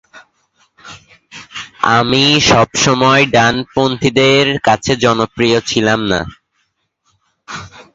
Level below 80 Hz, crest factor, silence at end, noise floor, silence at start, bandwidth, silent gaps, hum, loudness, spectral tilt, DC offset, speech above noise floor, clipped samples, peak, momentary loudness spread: -42 dBFS; 14 dB; 0.15 s; -65 dBFS; 0.15 s; 8 kHz; none; none; -12 LUFS; -4 dB/octave; under 0.1%; 53 dB; under 0.1%; 0 dBFS; 19 LU